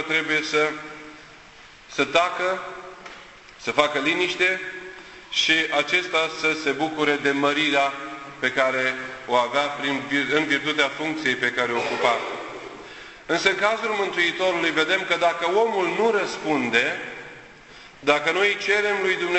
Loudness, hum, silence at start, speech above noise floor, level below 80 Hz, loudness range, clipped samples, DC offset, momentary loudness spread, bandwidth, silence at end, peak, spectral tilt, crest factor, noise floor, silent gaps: -22 LUFS; none; 0 s; 25 dB; -62 dBFS; 3 LU; under 0.1%; under 0.1%; 16 LU; 8.4 kHz; 0 s; -4 dBFS; -3 dB/octave; 20 dB; -47 dBFS; none